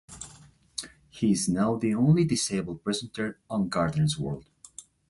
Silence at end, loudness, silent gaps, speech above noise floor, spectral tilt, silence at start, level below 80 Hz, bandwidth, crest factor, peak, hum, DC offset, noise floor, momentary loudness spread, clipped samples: 0.3 s; -27 LUFS; none; 28 dB; -5.5 dB/octave; 0.1 s; -56 dBFS; 11.5 kHz; 16 dB; -12 dBFS; none; under 0.1%; -54 dBFS; 21 LU; under 0.1%